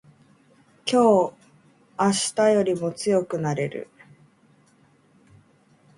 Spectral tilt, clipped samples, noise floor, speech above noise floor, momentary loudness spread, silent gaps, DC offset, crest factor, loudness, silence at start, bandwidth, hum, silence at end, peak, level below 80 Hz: -4.5 dB/octave; under 0.1%; -59 dBFS; 38 dB; 14 LU; none; under 0.1%; 18 dB; -22 LUFS; 0.85 s; 11.5 kHz; none; 2.15 s; -6 dBFS; -66 dBFS